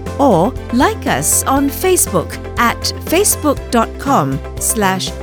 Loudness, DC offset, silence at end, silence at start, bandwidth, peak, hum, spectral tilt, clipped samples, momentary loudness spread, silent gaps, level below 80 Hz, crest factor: -14 LUFS; under 0.1%; 0 s; 0 s; over 20 kHz; 0 dBFS; none; -3.5 dB/octave; under 0.1%; 5 LU; none; -32 dBFS; 14 dB